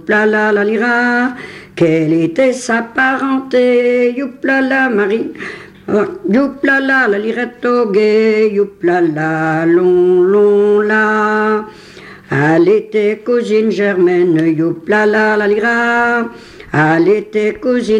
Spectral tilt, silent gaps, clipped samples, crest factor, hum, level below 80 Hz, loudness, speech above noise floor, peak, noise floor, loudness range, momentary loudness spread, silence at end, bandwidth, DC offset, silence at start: -6.5 dB/octave; none; under 0.1%; 12 dB; none; -54 dBFS; -13 LUFS; 23 dB; -2 dBFS; -35 dBFS; 2 LU; 7 LU; 0 s; 11 kHz; under 0.1%; 0.05 s